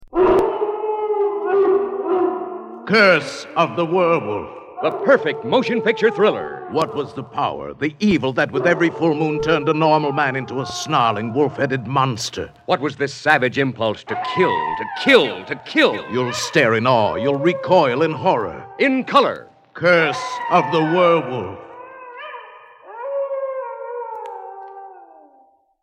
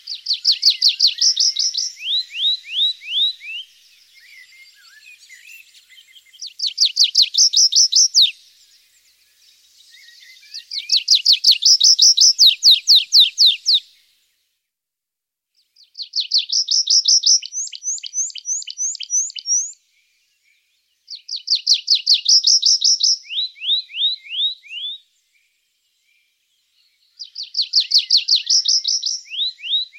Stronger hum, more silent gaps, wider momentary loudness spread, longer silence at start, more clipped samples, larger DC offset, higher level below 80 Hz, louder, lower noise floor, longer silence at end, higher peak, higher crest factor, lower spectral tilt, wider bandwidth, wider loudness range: neither; neither; second, 15 LU vs 18 LU; about the same, 0 s vs 0.05 s; neither; neither; first, -54 dBFS vs -84 dBFS; second, -18 LUFS vs -13 LUFS; second, -55 dBFS vs -84 dBFS; first, 0.8 s vs 0.15 s; about the same, 0 dBFS vs -2 dBFS; about the same, 18 dB vs 18 dB; first, -5.5 dB/octave vs 10.5 dB/octave; second, 13.5 kHz vs 16.5 kHz; second, 4 LU vs 12 LU